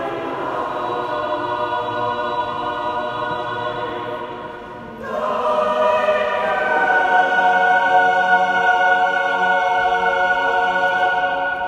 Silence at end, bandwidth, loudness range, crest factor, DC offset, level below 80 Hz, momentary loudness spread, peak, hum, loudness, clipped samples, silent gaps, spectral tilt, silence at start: 0 s; 9.6 kHz; 8 LU; 16 dB; under 0.1%; -54 dBFS; 10 LU; -2 dBFS; none; -18 LUFS; under 0.1%; none; -4 dB/octave; 0 s